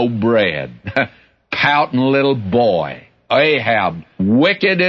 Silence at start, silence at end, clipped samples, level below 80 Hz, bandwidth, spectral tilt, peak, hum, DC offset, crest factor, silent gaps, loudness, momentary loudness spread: 0 s; 0 s; under 0.1%; -52 dBFS; 6.8 kHz; -7.5 dB/octave; -2 dBFS; none; under 0.1%; 14 dB; none; -16 LUFS; 10 LU